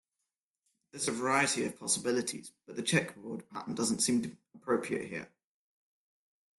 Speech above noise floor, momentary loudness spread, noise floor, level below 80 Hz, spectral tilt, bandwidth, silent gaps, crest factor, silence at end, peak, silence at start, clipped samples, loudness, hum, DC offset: 55 dB; 15 LU; -88 dBFS; -74 dBFS; -3 dB/octave; 12.5 kHz; none; 22 dB; 1.3 s; -14 dBFS; 0.95 s; under 0.1%; -32 LUFS; none; under 0.1%